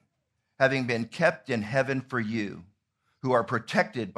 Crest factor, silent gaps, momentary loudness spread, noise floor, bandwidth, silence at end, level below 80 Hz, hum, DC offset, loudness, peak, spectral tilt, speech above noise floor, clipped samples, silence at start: 22 dB; none; 8 LU; -78 dBFS; 12.5 kHz; 0.05 s; -70 dBFS; none; under 0.1%; -28 LUFS; -6 dBFS; -6 dB/octave; 51 dB; under 0.1%; 0.6 s